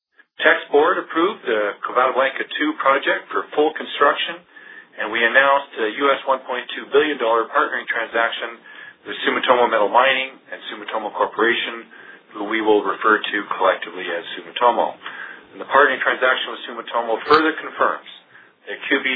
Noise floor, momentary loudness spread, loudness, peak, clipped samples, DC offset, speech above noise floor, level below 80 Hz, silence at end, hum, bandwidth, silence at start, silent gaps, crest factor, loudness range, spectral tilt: -48 dBFS; 15 LU; -19 LUFS; 0 dBFS; under 0.1%; under 0.1%; 28 dB; -68 dBFS; 0 s; none; 4.9 kHz; 0.4 s; none; 20 dB; 2 LU; -6 dB/octave